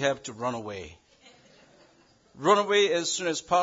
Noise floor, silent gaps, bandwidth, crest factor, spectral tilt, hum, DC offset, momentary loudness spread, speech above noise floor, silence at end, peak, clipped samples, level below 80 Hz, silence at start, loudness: -61 dBFS; none; 7.8 kHz; 20 dB; -3 dB/octave; none; under 0.1%; 17 LU; 35 dB; 0 s; -8 dBFS; under 0.1%; -66 dBFS; 0 s; -26 LUFS